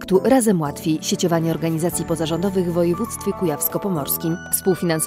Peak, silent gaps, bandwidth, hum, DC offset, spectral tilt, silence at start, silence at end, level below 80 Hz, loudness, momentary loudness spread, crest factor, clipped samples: -2 dBFS; none; 16 kHz; none; under 0.1%; -5 dB/octave; 0 s; 0 s; -50 dBFS; -20 LUFS; 6 LU; 18 dB; under 0.1%